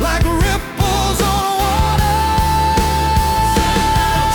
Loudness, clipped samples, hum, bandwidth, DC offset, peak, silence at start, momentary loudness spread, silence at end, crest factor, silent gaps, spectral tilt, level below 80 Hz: -15 LUFS; under 0.1%; none; 19 kHz; under 0.1%; -4 dBFS; 0 s; 2 LU; 0 s; 12 dB; none; -4.5 dB/octave; -20 dBFS